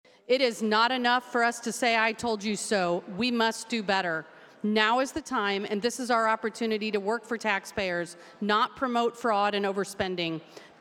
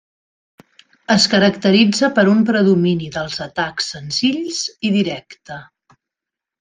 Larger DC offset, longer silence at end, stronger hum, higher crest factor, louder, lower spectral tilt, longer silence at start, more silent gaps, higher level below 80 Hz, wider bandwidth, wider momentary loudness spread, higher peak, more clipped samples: neither; second, 0.15 s vs 0.95 s; neither; about the same, 20 dB vs 16 dB; second, -27 LUFS vs -16 LUFS; about the same, -3.5 dB/octave vs -4.5 dB/octave; second, 0.3 s vs 1.1 s; neither; second, -66 dBFS vs -56 dBFS; first, 16.5 kHz vs 9.6 kHz; second, 7 LU vs 18 LU; second, -8 dBFS vs -2 dBFS; neither